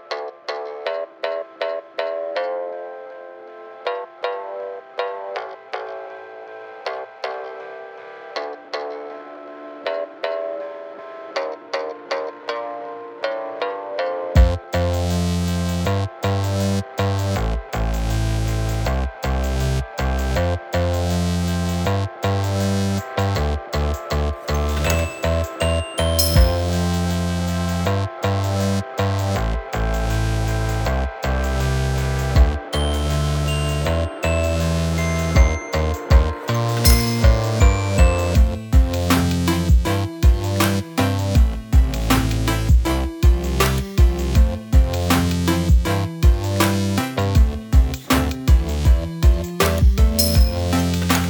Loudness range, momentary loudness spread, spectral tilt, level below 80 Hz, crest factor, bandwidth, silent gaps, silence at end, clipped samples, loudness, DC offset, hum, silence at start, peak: 11 LU; 13 LU; -5.5 dB/octave; -22 dBFS; 18 dB; 19 kHz; none; 0 s; under 0.1%; -21 LUFS; under 0.1%; none; 0.05 s; 0 dBFS